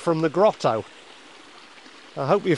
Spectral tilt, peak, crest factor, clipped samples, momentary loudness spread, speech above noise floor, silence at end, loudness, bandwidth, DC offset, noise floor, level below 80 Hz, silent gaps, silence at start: -6.5 dB/octave; -6 dBFS; 18 dB; under 0.1%; 25 LU; 26 dB; 0 s; -22 LUFS; 11.5 kHz; 0.1%; -47 dBFS; -70 dBFS; none; 0 s